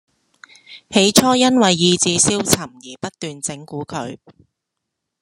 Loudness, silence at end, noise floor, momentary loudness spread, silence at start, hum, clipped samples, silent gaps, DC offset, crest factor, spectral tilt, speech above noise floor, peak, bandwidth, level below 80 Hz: -15 LUFS; 1.05 s; -79 dBFS; 18 LU; 0.7 s; none; under 0.1%; none; under 0.1%; 20 dB; -3 dB/octave; 62 dB; 0 dBFS; 16 kHz; -54 dBFS